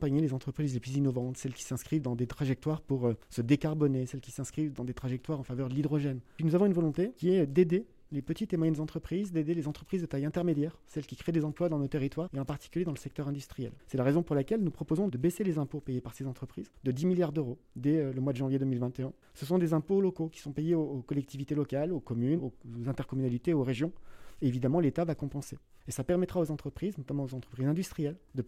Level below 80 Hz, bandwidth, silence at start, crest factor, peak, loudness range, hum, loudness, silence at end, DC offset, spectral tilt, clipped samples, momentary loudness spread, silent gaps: -58 dBFS; 15 kHz; 0 s; 18 dB; -14 dBFS; 3 LU; none; -33 LUFS; 0 s; under 0.1%; -8 dB/octave; under 0.1%; 10 LU; none